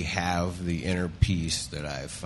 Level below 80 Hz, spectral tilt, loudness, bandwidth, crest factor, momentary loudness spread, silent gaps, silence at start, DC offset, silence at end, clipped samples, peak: -40 dBFS; -4.5 dB/octave; -29 LUFS; 11.5 kHz; 22 dB; 7 LU; none; 0 s; under 0.1%; 0 s; under 0.1%; -8 dBFS